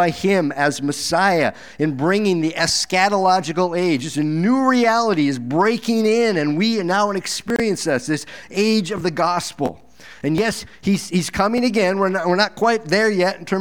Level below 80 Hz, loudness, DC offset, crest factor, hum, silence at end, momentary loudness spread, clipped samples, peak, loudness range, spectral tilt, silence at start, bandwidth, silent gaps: -52 dBFS; -19 LUFS; 0.5%; 18 dB; none; 0 s; 7 LU; under 0.1%; -2 dBFS; 4 LU; -4.5 dB/octave; 0 s; 19 kHz; none